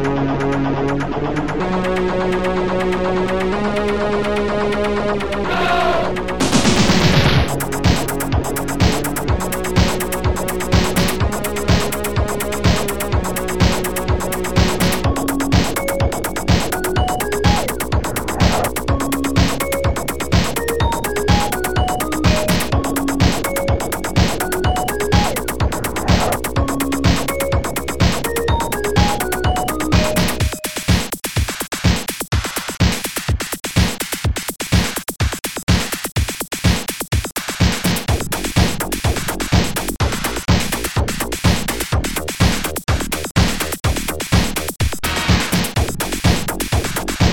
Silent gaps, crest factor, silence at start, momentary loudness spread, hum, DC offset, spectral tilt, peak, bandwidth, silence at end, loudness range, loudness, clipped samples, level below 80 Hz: 35.63-35.67 s, 43.31-43.35 s; 16 dB; 0 s; 5 LU; none; 3%; -4.5 dB/octave; -2 dBFS; 19 kHz; 0 s; 3 LU; -18 LUFS; under 0.1%; -26 dBFS